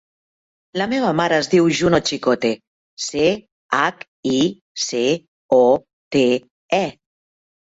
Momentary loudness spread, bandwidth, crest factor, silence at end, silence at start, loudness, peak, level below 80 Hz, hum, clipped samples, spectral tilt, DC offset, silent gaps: 10 LU; 8 kHz; 16 dB; 0.75 s; 0.75 s; -19 LUFS; -2 dBFS; -54 dBFS; none; under 0.1%; -4.5 dB/octave; under 0.1%; 2.67-2.97 s, 3.52-3.69 s, 4.08-4.23 s, 4.61-4.75 s, 5.28-5.49 s, 5.93-6.11 s, 6.51-6.69 s